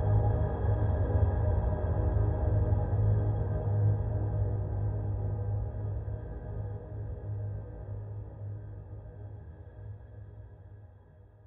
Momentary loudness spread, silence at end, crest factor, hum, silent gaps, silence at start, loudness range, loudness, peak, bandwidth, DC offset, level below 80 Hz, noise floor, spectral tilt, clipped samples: 18 LU; 0.1 s; 14 dB; none; none; 0 s; 15 LU; -32 LUFS; -16 dBFS; 2 kHz; under 0.1%; -38 dBFS; -55 dBFS; -11 dB/octave; under 0.1%